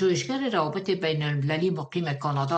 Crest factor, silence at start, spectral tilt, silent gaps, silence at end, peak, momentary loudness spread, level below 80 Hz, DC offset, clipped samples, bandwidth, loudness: 16 dB; 0 s; -6 dB/octave; none; 0 s; -10 dBFS; 3 LU; -66 dBFS; under 0.1%; under 0.1%; 8.6 kHz; -27 LUFS